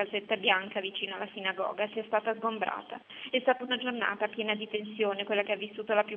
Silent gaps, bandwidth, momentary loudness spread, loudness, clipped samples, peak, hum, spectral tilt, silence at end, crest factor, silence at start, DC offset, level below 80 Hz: none; 4.2 kHz; 7 LU; -31 LUFS; under 0.1%; -12 dBFS; none; -0.5 dB/octave; 0 s; 20 dB; 0 s; under 0.1%; -84 dBFS